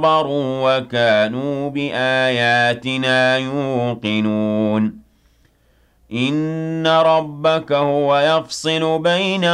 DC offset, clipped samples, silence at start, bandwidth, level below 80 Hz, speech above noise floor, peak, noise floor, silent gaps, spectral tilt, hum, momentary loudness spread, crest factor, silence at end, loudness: under 0.1%; under 0.1%; 0 s; 12 kHz; -58 dBFS; 40 dB; -4 dBFS; -57 dBFS; none; -5.5 dB/octave; none; 6 LU; 12 dB; 0 s; -17 LUFS